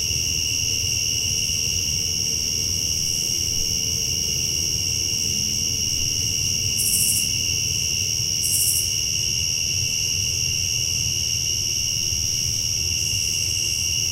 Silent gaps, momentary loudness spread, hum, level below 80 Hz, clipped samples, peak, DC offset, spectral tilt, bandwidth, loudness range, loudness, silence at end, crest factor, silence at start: none; 2 LU; none; -40 dBFS; under 0.1%; -4 dBFS; under 0.1%; -0.5 dB/octave; 16 kHz; 1 LU; -20 LUFS; 0 s; 18 dB; 0 s